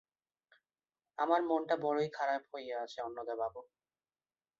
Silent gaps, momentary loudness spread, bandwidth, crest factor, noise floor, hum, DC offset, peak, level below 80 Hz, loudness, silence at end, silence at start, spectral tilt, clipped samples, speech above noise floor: none; 10 LU; 7.4 kHz; 22 dB; under -90 dBFS; none; under 0.1%; -16 dBFS; -80 dBFS; -36 LUFS; 0.95 s; 1.2 s; -3.5 dB/octave; under 0.1%; over 55 dB